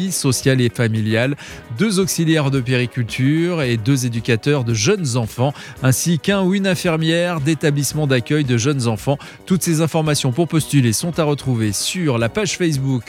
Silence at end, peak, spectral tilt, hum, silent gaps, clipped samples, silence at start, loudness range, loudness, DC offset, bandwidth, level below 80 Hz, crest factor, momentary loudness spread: 0.05 s; -2 dBFS; -5 dB/octave; none; none; under 0.1%; 0 s; 1 LU; -18 LUFS; under 0.1%; 16.5 kHz; -48 dBFS; 16 dB; 5 LU